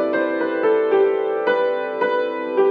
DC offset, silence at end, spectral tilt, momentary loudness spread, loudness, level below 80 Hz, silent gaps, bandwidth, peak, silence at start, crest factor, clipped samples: under 0.1%; 0 s; -7 dB/octave; 5 LU; -20 LUFS; -82 dBFS; none; 4.9 kHz; -6 dBFS; 0 s; 12 dB; under 0.1%